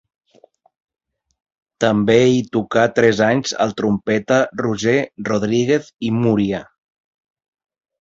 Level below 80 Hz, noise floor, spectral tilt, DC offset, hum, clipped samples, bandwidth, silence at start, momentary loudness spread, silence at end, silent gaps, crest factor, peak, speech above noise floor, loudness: -54 dBFS; -53 dBFS; -5.5 dB/octave; under 0.1%; none; under 0.1%; 8 kHz; 1.8 s; 7 LU; 1.4 s; none; 18 dB; 0 dBFS; 37 dB; -17 LUFS